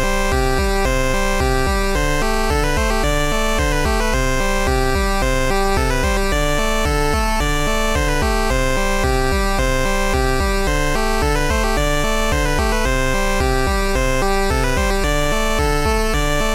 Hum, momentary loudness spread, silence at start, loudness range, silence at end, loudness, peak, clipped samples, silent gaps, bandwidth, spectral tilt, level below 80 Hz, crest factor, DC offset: none; 1 LU; 0 s; 0 LU; 0 s; -18 LUFS; -4 dBFS; under 0.1%; none; 16.5 kHz; -4 dB/octave; -20 dBFS; 12 dB; under 0.1%